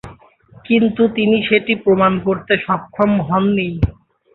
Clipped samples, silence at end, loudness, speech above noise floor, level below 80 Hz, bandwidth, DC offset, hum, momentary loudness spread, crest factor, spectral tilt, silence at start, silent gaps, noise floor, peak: under 0.1%; 0.45 s; -16 LUFS; 31 dB; -36 dBFS; 4.2 kHz; under 0.1%; none; 6 LU; 16 dB; -9 dB/octave; 0.05 s; none; -46 dBFS; -2 dBFS